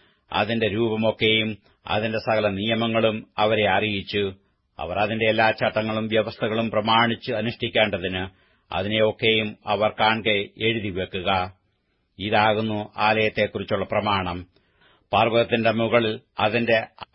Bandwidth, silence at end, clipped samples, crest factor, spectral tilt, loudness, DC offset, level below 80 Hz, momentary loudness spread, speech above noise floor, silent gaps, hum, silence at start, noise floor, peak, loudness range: 5.8 kHz; 0.1 s; under 0.1%; 20 dB; -10 dB/octave; -23 LUFS; under 0.1%; -56 dBFS; 9 LU; 47 dB; none; none; 0.3 s; -70 dBFS; -4 dBFS; 1 LU